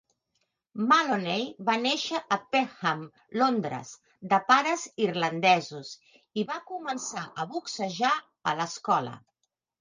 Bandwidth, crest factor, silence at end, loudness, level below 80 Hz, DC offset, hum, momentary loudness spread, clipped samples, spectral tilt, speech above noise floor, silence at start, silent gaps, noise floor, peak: 10 kHz; 22 dB; 0.65 s; -27 LUFS; -78 dBFS; under 0.1%; none; 15 LU; under 0.1%; -3.5 dB/octave; 50 dB; 0.75 s; none; -78 dBFS; -6 dBFS